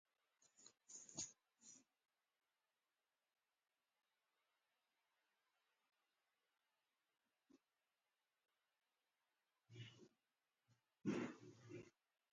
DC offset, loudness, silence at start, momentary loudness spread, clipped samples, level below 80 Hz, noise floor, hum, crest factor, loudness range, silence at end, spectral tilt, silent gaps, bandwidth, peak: under 0.1%; -54 LUFS; 0.4 s; 20 LU; under 0.1%; under -90 dBFS; under -90 dBFS; none; 28 dB; 5 LU; 0.4 s; -4 dB/octave; none; 9 kHz; -34 dBFS